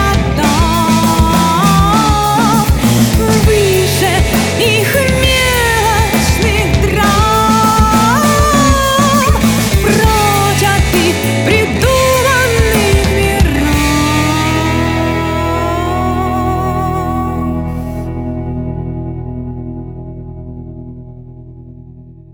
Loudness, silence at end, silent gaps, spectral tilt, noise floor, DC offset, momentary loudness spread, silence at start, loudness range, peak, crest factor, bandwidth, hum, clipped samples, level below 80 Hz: -11 LUFS; 0.2 s; none; -4.5 dB/octave; -35 dBFS; under 0.1%; 12 LU; 0 s; 11 LU; 0 dBFS; 12 dB; over 20 kHz; none; under 0.1%; -20 dBFS